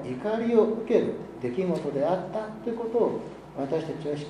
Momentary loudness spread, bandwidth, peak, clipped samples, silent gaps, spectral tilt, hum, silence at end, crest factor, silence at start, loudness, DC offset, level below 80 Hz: 10 LU; 10.5 kHz; -8 dBFS; under 0.1%; none; -7.5 dB/octave; none; 0 s; 18 dB; 0 s; -28 LUFS; under 0.1%; -60 dBFS